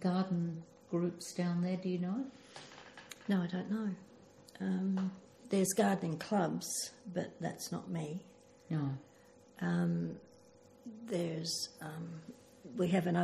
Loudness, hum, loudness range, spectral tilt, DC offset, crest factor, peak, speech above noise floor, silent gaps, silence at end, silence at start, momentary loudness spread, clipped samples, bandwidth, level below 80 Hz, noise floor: -37 LUFS; none; 4 LU; -5.5 dB/octave; under 0.1%; 20 dB; -18 dBFS; 25 dB; none; 0 s; 0 s; 18 LU; under 0.1%; 14.5 kHz; -78 dBFS; -61 dBFS